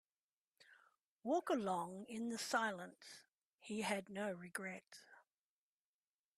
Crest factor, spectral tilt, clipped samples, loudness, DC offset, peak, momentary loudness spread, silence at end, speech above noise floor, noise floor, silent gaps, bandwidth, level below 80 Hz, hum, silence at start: 22 dB; -4 dB/octave; under 0.1%; -43 LUFS; under 0.1%; -24 dBFS; 19 LU; 1.2 s; over 47 dB; under -90 dBFS; 1.05-1.19 s, 3.29-3.58 s; 14.5 kHz; -88 dBFS; none; 0.6 s